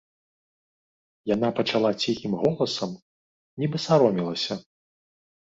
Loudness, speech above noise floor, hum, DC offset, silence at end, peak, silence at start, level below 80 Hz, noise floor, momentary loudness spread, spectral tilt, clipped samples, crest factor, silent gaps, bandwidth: -25 LUFS; over 66 dB; none; under 0.1%; 0.8 s; -8 dBFS; 1.25 s; -64 dBFS; under -90 dBFS; 13 LU; -6 dB/octave; under 0.1%; 20 dB; 3.02-3.57 s; 8 kHz